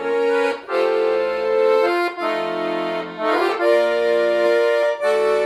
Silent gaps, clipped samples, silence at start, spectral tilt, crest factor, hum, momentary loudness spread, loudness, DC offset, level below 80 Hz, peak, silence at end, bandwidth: none; under 0.1%; 0 s; -4 dB/octave; 12 dB; none; 6 LU; -19 LUFS; under 0.1%; -62 dBFS; -6 dBFS; 0 s; 12.5 kHz